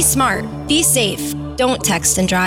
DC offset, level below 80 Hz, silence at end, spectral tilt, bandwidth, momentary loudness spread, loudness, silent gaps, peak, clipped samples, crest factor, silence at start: under 0.1%; -36 dBFS; 0 s; -3 dB/octave; 17 kHz; 9 LU; -15 LUFS; none; -2 dBFS; under 0.1%; 14 dB; 0 s